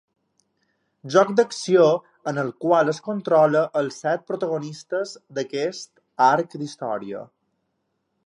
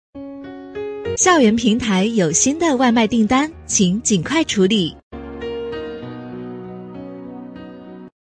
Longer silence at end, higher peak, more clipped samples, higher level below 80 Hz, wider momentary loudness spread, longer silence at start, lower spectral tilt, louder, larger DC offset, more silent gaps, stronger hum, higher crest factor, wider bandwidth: first, 1 s vs 0.25 s; about the same, -4 dBFS vs -2 dBFS; neither; second, -76 dBFS vs -48 dBFS; second, 13 LU vs 19 LU; first, 1.05 s vs 0.15 s; first, -5.5 dB/octave vs -4 dB/octave; second, -22 LUFS vs -17 LUFS; neither; second, none vs 5.03-5.11 s; neither; about the same, 20 dB vs 16 dB; about the same, 11 kHz vs 10.5 kHz